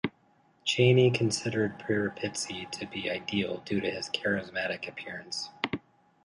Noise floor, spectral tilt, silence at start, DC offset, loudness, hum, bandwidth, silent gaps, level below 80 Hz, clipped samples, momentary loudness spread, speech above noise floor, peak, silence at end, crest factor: -65 dBFS; -5 dB/octave; 0.05 s; under 0.1%; -30 LUFS; none; 11.5 kHz; none; -64 dBFS; under 0.1%; 13 LU; 36 dB; -10 dBFS; 0.45 s; 20 dB